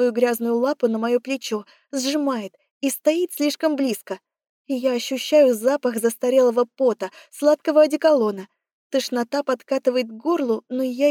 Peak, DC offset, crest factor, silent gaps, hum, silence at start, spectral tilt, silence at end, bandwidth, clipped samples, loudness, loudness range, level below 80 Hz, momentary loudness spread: -6 dBFS; under 0.1%; 16 dB; 2.71-2.81 s, 4.49-4.65 s, 8.72-8.90 s; none; 0 s; -3.5 dB/octave; 0 s; 18.5 kHz; under 0.1%; -21 LUFS; 5 LU; -86 dBFS; 12 LU